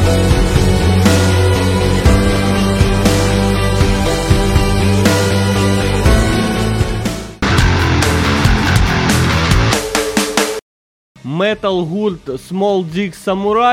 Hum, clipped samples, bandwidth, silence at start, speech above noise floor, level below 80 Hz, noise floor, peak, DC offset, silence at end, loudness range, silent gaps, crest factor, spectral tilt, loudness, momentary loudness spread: none; under 0.1%; 16 kHz; 0 s; over 74 dB; -20 dBFS; under -90 dBFS; 0 dBFS; under 0.1%; 0 s; 5 LU; 10.62-11.15 s; 12 dB; -5.5 dB/octave; -14 LUFS; 7 LU